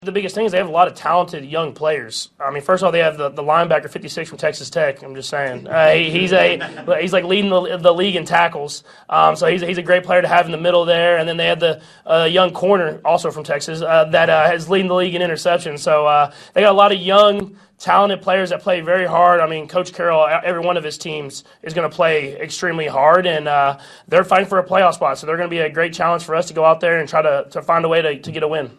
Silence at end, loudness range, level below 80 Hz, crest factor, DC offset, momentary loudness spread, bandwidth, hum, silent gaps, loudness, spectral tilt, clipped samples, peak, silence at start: 0.1 s; 4 LU; -60 dBFS; 16 dB; under 0.1%; 10 LU; 12.5 kHz; none; none; -16 LUFS; -4.5 dB/octave; under 0.1%; 0 dBFS; 0 s